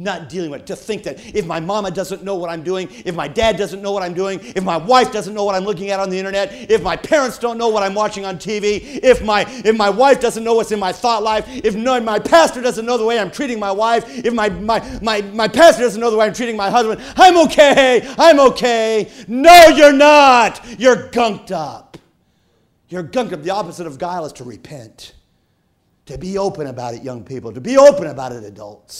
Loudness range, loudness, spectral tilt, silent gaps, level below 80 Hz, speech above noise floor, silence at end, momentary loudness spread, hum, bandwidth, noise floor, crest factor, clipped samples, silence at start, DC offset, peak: 17 LU; -14 LUFS; -4 dB/octave; none; -44 dBFS; 47 dB; 0 s; 17 LU; none; 16 kHz; -62 dBFS; 14 dB; 0.2%; 0 s; under 0.1%; 0 dBFS